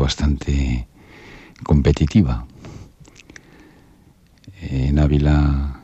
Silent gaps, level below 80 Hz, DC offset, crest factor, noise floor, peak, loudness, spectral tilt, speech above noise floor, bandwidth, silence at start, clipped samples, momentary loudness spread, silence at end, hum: none; -24 dBFS; under 0.1%; 16 dB; -52 dBFS; -2 dBFS; -19 LUFS; -7 dB/octave; 35 dB; 8.2 kHz; 0 s; under 0.1%; 23 LU; 0.05 s; none